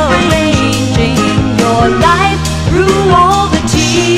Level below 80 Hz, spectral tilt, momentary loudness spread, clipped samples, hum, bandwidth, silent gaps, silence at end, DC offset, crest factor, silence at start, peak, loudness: -24 dBFS; -5 dB/octave; 4 LU; under 0.1%; none; 15.5 kHz; none; 0 s; under 0.1%; 10 dB; 0 s; 0 dBFS; -10 LUFS